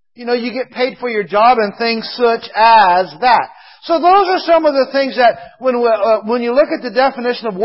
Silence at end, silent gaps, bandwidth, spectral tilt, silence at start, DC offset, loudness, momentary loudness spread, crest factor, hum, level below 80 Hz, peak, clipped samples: 0 s; none; 5.8 kHz; -7 dB/octave; 0.2 s; under 0.1%; -13 LUFS; 9 LU; 14 dB; none; -56 dBFS; 0 dBFS; under 0.1%